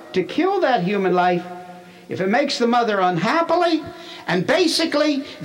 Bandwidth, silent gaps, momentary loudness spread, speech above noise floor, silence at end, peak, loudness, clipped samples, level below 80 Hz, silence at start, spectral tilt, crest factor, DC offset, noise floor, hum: 16.5 kHz; none; 9 LU; 21 dB; 0 s; -6 dBFS; -19 LUFS; under 0.1%; -64 dBFS; 0 s; -5 dB/octave; 14 dB; under 0.1%; -40 dBFS; none